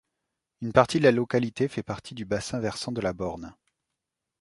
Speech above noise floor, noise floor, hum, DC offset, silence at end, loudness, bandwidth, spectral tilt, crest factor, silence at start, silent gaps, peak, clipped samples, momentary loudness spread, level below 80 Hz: 59 dB; -85 dBFS; none; under 0.1%; 0.9 s; -26 LUFS; 11.5 kHz; -5.5 dB/octave; 26 dB; 0.6 s; none; -2 dBFS; under 0.1%; 15 LU; -56 dBFS